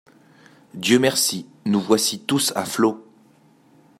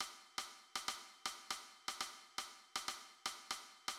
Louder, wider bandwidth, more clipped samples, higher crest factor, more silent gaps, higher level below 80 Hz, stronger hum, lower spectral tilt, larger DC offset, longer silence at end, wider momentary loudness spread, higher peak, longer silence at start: first, -20 LUFS vs -46 LUFS; about the same, 16 kHz vs 17 kHz; neither; about the same, 20 dB vs 22 dB; neither; first, -66 dBFS vs -80 dBFS; neither; first, -3.5 dB/octave vs 1.5 dB/octave; neither; first, 1 s vs 0 s; first, 10 LU vs 3 LU; first, -2 dBFS vs -28 dBFS; first, 0.75 s vs 0 s